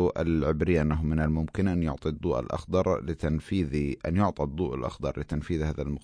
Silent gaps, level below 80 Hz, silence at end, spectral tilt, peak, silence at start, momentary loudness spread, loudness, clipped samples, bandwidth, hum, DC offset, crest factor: none; -38 dBFS; 0.05 s; -8.5 dB/octave; -10 dBFS; 0 s; 6 LU; -28 LUFS; under 0.1%; 10.5 kHz; none; under 0.1%; 16 dB